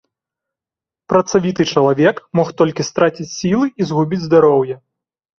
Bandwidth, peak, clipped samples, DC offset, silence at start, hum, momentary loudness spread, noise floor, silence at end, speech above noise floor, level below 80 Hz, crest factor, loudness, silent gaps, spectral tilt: 7.4 kHz; 0 dBFS; under 0.1%; under 0.1%; 1.1 s; none; 6 LU; -88 dBFS; 0.65 s; 74 dB; -54 dBFS; 16 dB; -16 LUFS; none; -6 dB/octave